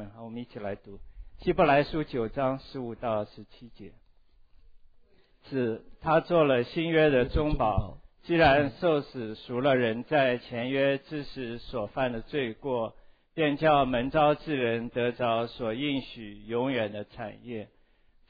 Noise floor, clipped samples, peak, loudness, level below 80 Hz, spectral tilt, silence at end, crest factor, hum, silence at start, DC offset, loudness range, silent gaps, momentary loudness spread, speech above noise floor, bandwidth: -62 dBFS; under 0.1%; -10 dBFS; -28 LUFS; -46 dBFS; -9 dB/octave; 0.65 s; 18 dB; none; 0 s; under 0.1%; 8 LU; none; 15 LU; 34 dB; 5 kHz